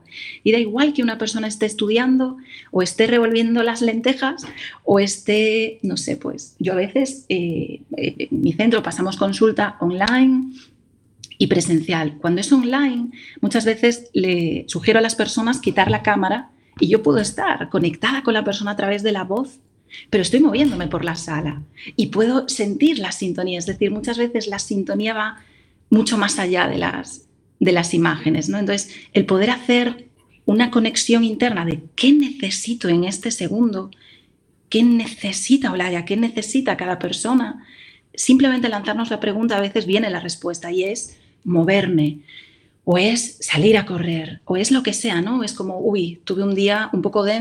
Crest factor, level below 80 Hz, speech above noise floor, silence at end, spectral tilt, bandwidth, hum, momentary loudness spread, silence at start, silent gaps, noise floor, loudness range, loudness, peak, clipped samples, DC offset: 18 dB; -54 dBFS; 40 dB; 0 s; -4.5 dB/octave; 12 kHz; none; 9 LU; 0.1 s; none; -59 dBFS; 3 LU; -19 LUFS; 0 dBFS; under 0.1%; under 0.1%